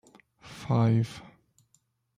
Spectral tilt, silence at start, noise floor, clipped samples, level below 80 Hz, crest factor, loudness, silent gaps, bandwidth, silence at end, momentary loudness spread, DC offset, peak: -8 dB/octave; 0.45 s; -71 dBFS; under 0.1%; -64 dBFS; 18 dB; -27 LUFS; none; 10 kHz; 1 s; 23 LU; under 0.1%; -14 dBFS